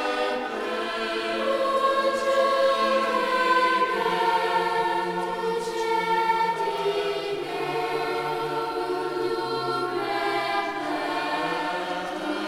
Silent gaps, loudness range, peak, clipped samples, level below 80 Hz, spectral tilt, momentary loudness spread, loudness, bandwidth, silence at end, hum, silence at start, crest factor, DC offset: none; 5 LU; -10 dBFS; under 0.1%; -62 dBFS; -4 dB/octave; 7 LU; -25 LUFS; 16 kHz; 0 s; none; 0 s; 16 dB; under 0.1%